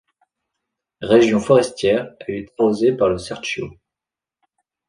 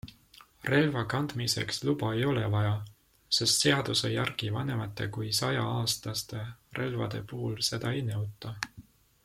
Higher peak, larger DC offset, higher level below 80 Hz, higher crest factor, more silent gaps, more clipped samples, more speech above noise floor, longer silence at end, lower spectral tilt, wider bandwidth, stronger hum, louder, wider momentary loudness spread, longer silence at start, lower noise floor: first, -2 dBFS vs -10 dBFS; neither; first, -52 dBFS vs -60 dBFS; about the same, 18 dB vs 20 dB; neither; neither; first, 71 dB vs 27 dB; first, 1.2 s vs 0.45 s; first, -5.5 dB/octave vs -4 dB/octave; second, 10.5 kHz vs 16 kHz; neither; first, -18 LUFS vs -30 LUFS; about the same, 15 LU vs 13 LU; first, 1 s vs 0.05 s; first, -88 dBFS vs -57 dBFS